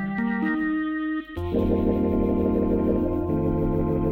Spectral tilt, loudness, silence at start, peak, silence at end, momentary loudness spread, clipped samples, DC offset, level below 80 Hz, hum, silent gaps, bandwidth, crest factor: -10 dB/octave; -24 LUFS; 0 s; -8 dBFS; 0 s; 4 LU; under 0.1%; under 0.1%; -36 dBFS; none; none; 15 kHz; 14 dB